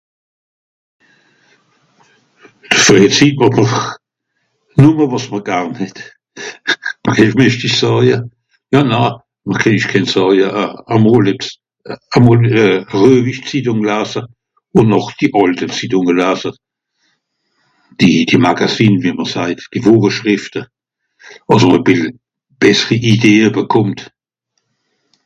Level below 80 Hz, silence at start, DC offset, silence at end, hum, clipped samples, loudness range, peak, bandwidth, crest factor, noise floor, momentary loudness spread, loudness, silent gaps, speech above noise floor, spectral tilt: -48 dBFS; 2.7 s; under 0.1%; 1.2 s; none; 0.6%; 3 LU; 0 dBFS; 9.6 kHz; 14 dB; -70 dBFS; 14 LU; -12 LUFS; none; 58 dB; -5.5 dB/octave